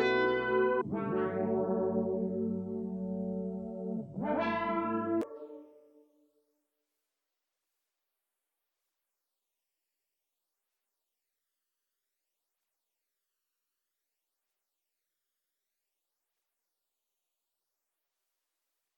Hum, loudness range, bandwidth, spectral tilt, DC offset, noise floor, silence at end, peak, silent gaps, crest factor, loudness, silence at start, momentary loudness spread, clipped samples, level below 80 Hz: none; 7 LU; 6.4 kHz; -8 dB/octave; under 0.1%; -88 dBFS; 13.2 s; -18 dBFS; none; 20 dB; -33 LUFS; 0 s; 10 LU; under 0.1%; -70 dBFS